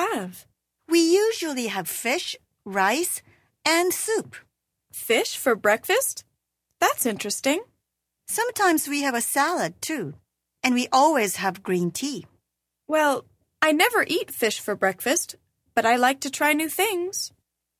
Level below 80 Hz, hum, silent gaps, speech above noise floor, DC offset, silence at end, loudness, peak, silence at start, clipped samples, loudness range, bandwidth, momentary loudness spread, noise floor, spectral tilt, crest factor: -70 dBFS; none; none; 57 dB; under 0.1%; 0.5 s; -23 LUFS; -4 dBFS; 0 s; under 0.1%; 2 LU; 16 kHz; 11 LU; -80 dBFS; -2.5 dB/octave; 20 dB